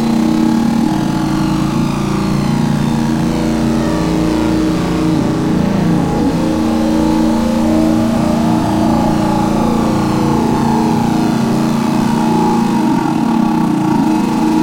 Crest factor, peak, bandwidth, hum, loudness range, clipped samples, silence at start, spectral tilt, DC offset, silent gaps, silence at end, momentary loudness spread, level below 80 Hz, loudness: 12 dB; -2 dBFS; 16.5 kHz; none; 1 LU; under 0.1%; 0 s; -6.5 dB/octave; under 0.1%; none; 0 s; 2 LU; -32 dBFS; -14 LUFS